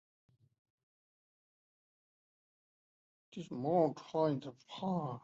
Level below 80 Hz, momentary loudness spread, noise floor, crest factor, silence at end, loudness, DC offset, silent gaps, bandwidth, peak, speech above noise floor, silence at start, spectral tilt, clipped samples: -82 dBFS; 17 LU; under -90 dBFS; 22 dB; 0.05 s; -36 LUFS; under 0.1%; none; 7.6 kHz; -20 dBFS; over 54 dB; 3.3 s; -7 dB/octave; under 0.1%